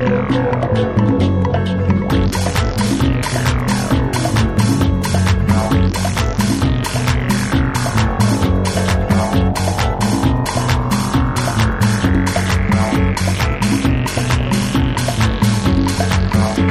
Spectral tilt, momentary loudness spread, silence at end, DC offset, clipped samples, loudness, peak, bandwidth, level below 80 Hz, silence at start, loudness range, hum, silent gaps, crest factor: -5.5 dB/octave; 2 LU; 0 s; under 0.1%; under 0.1%; -16 LUFS; -2 dBFS; 15.5 kHz; -24 dBFS; 0 s; 0 LU; none; none; 14 dB